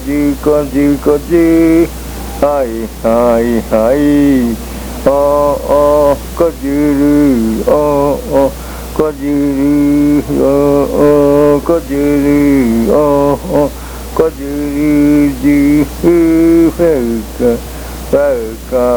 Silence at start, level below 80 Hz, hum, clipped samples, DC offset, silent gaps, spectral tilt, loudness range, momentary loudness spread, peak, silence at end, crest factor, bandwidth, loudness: 0 s; -26 dBFS; none; 0.2%; under 0.1%; none; -7 dB/octave; 2 LU; 8 LU; 0 dBFS; 0 s; 10 dB; over 20 kHz; -11 LUFS